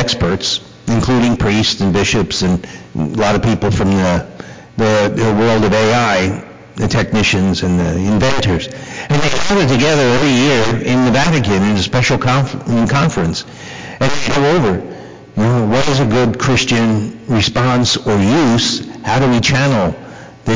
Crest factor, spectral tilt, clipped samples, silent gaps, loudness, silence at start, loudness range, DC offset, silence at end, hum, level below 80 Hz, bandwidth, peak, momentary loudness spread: 8 dB; -5 dB/octave; under 0.1%; none; -14 LUFS; 0 s; 3 LU; under 0.1%; 0 s; none; -32 dBFS; 7.6 kHz; -6 dBFS; 9 LU